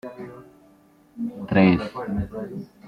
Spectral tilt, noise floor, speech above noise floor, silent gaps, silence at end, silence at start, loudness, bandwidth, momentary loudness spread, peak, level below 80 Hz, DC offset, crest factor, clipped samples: -9 dB/octave; -55 dBFS; 33 dB; none; 0 s; 0.05 s; -23 LUFS; 5.4 kHz; 20 LU; -4 dBFS; -48 dBFS; under 0.1%; 20 dB; under 0.1%